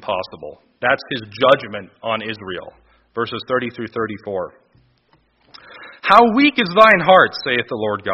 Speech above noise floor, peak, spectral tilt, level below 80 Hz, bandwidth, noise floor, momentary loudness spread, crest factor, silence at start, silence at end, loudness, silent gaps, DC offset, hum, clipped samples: 42 dB; 0 dBFS; -2 dB/octave; -56 dBFS; 6 kHz; -59 dBFS; 20 LU; 18 dB; 0 s; 0 s; -16 LUFS; none; under 0.1%; none; under 0.1%